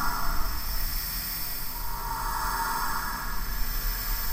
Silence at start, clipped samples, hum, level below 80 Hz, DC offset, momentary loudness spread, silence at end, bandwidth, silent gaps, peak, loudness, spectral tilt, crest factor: 0 s; under 0.1%; none; -32 dBFS; under 0.1%; 5 LU; 0 s; 16 kHz; none; -14 dBFS; -30 LUFS; -2 dB/octave; 14 dB